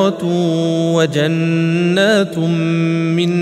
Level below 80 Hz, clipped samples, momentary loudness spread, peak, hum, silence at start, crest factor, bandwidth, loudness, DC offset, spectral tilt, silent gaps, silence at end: -62 dBFS; under 0.1%; 3 LU; 0 dBFS; none; 0 s; 14 dB; 12 kHz; -15 LUFS; under 0.1%; -6.5 dB/octave; none; 0 s